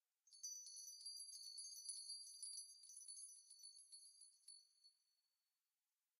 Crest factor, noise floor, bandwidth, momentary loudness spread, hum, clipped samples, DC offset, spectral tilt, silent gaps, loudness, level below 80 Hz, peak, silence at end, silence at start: 20 dB; under -90 dBFS; 14.5 kHz; 12 LU; none; under 0.1%; under 0.1%; 6.5 dB/octave; none; -55 LUFS; under -90 dBFS; -40 dBFS; 1.25 s; 0.25 s